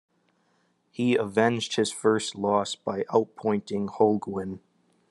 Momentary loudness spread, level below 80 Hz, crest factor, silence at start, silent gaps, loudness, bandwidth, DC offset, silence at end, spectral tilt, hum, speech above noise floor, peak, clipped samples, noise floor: 10 LU; -74 dBFS; 20 dB; 1 s; none; -26 LUFS; 12 kHz; under 0.1%; 0.55 s; -5 dB/octave; none; 43 dB; -8 dBFS; under 0.1%; -69 dBFS